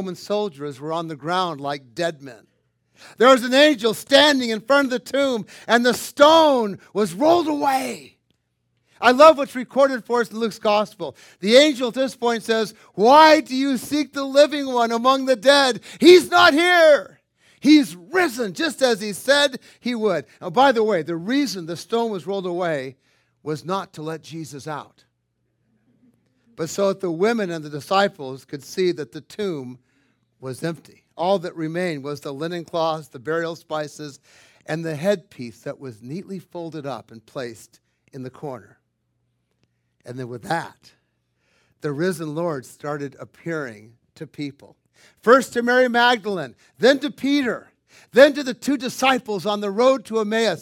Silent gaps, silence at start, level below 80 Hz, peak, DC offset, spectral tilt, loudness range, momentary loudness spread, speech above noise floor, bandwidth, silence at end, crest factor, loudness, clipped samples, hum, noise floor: none; 0 s; -70 dBFS; 0 dBFS; under 0.1%; -4 dB/octave; 17 LU; 20 LU; 52 dB; 17 kHz; 0 s; 20 dB; -19 LUFS; under 0.1%; none; -71 dBFS